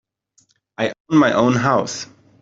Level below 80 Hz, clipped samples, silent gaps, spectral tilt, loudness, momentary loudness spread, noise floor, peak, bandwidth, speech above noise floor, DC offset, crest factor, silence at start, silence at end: -56 dBFS; under 0.1%; 1.00-1.05 s; -5.5 dB/octave; -18 LUFS; 14 LU; -61 dBFS; -2 dBFS; 7.8 kHz; 44 dB; under 0.1%; 16 dB; 0.8 s; 0.35 s